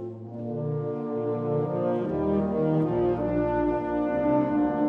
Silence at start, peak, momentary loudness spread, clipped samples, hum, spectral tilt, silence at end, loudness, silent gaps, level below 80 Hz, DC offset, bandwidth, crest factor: 0 s; -12 dBFS; 6 LU; under 0.1%; none; -11 dB/octave; 0 s; -26 LUFS; none; -48 dBFS; under 0.1%; 4.4 kHz; 14 dB